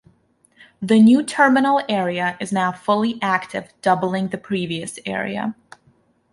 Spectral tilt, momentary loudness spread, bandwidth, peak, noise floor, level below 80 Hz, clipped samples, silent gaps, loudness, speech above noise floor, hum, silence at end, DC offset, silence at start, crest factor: -5.5 dB/octave; 13 LU; 11.5 kHz; -4 dBFS; -59 dBFS; -64 dBFS; under 0.1%; none; -19 LUFS; 40 dB; none; 0.8 s; under 0.1%; 0.8 s; 16 dB